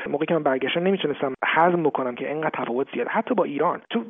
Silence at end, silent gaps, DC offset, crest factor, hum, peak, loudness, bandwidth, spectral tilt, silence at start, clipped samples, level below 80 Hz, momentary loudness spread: 0 s; none; under 0.1%; 18 dB; none; -4 dBFS; -23 LUFS; 3.9 kHz; -3.5 dB/octave; 0 s; under 0.1%; -72 dBFS; 7 LU